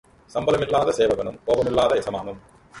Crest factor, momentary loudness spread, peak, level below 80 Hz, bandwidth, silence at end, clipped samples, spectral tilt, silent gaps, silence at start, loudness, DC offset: 16 dB; 12 LU; -6 dBFS; -48 dBFS; 11.5 kHz; 0 s; under 0.1%; -5 dB/octave; none; 0.35 s; -22 LUFS; under 0.1%